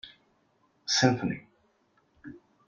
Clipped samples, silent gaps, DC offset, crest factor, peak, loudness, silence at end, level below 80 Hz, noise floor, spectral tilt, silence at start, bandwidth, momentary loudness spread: under 0.1%; none; under 0.1%; 26 dB; -6 dBFS; -27 LUFS; 0.3 s; -66 dBFS; -69 dBFS; -4 dB/octave; 0.05 s; 7.8 kHz; 25 LU